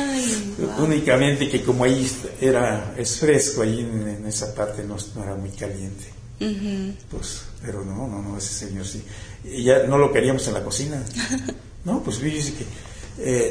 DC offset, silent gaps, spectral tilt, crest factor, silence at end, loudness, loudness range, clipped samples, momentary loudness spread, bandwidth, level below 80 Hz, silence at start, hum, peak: under 0.1%; none; -4.5 dB/octave; 20 dB; 0 s; -23 LUFS; 10 LU; under 0.1%; 15 LU; 11 kHz; -42 dBFS; 0 s; none; -2 dBFS